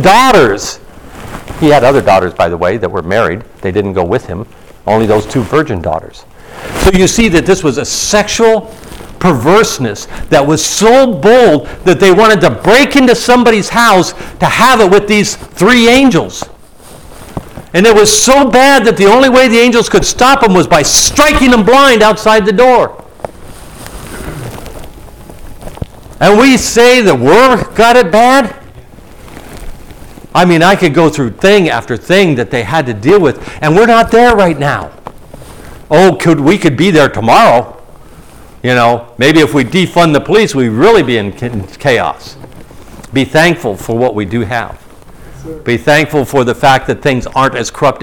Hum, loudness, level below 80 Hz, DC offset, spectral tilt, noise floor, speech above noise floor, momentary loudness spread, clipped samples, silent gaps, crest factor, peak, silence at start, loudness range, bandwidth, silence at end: none; -8 LUFS; -30 dBFS; under 0.1%; -4 dB/octave; -35 dBFS; 27 dB; 16 LU; under 0.1%; none; 8 dB; 0 dBFS; 0 s; 7 LU; 18 kHz; 0 s